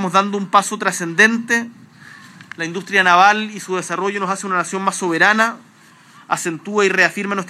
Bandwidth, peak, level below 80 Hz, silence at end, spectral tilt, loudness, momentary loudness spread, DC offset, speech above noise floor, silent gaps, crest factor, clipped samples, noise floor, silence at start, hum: 15 kHz; 0 dBFS; -80 dBFS; 0 s; -3.5 dB/octave; -16 LUFS; 11 LU; under 0.1%; 30 dB; none; 18 dB; under 0.1%; -47 dBFS; 0 s; none